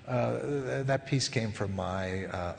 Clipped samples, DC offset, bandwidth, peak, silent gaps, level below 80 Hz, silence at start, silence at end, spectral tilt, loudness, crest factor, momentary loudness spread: under 0.1%; under 0.1%; 9.8 kHz; -12 dBFS; none; -58 dBFS; 0 s; 0 s; -5.5 dB/octave; -32 LUFS; 18 dB; 5 LU